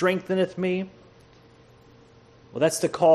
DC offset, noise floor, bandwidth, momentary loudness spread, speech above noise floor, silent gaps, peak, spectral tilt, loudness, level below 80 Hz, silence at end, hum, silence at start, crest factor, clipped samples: under 0.1%; -53 dBFS; 13 kHz; 12 LU; 31 dB; none; -6 dBFS; -5 dB/octave; -25 LUFS; -64 dBFS; 0 s; none; 0 s; 18 dB; under 0.1%